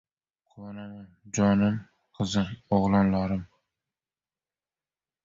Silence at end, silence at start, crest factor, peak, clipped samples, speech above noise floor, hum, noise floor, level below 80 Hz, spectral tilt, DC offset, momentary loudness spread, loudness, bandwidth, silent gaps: 1.8 s; 0.55 s; 18 dB; -10 dBFS; under 0.1%; over 64 dB; none; under -90 dBFS; -52 dBFS; -6.5 dB/octave; under 0.1%; 20 LU; -26 LUFS; 7.6 kHz; none